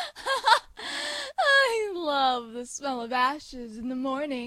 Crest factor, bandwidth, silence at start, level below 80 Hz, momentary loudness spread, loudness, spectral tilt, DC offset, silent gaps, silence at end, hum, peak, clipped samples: 22 dB; 15 kHz; 0 s; -60 dBFS; 13 LU; -26 LUFS; -1 dB/octave; under 0.1%; none; 0 s; none; -6 dBFS; under 0.1%